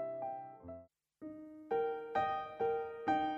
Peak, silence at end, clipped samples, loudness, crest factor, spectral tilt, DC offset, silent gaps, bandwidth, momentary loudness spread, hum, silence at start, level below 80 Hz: -22 dBFS; 0 s; under 0.1%; -38 LUFS; 18 dB; -6.5 dB/octave; under 0.1%; none; 7.8 kHz; 16 LU; none; 0 s; -74 dBFS